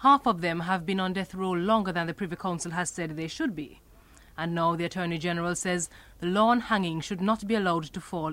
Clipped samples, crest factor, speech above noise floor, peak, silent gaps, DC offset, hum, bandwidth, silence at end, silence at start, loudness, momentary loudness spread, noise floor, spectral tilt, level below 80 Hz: under 0.1%; 18 dB; 26 dB; -10 dBFS; none; under 0.1%; none; 16 kHz; 0 s; 0 s; -28 LUFS; 10 LU; -54 dBFS; -5 dB/octave; -56 dBFS